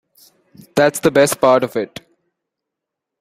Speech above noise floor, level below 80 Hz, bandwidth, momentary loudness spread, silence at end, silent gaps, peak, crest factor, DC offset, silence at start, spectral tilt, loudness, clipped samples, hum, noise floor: 67 dB; -58 dBFS; 16 kHz; 11 LU; 1.35 s; none; 0 dBFS; 18 dB; under 0.1%; 0.75 s; -4.5 dB/octave; -15 LUFS; under 0.1%; none; -82 dBFS